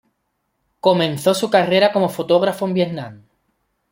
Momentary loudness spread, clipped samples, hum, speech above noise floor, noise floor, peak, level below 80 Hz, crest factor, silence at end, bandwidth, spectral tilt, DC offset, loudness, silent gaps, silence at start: 7 LU; under 0.1%; none; 54 dB; -71 dBFS; -2 dBFS; -62 dBFS; 18 dB; 0.75 s; 16.5 kHz; -5.5 dB/octave; under 0.1%; -17 LUFS; none; 0.85 s